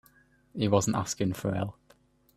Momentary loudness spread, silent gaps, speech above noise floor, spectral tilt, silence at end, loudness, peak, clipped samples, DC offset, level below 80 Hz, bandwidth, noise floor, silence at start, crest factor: 11 LU; none; 35 dB; -5.5 dB/octave; 0.65 s; -29 LUFS; -8 dBFS; under 0.1%; under 0.1%; -60 dBFS; 14.5 kHz; -63 dBFS; 0.55 s; 22 dB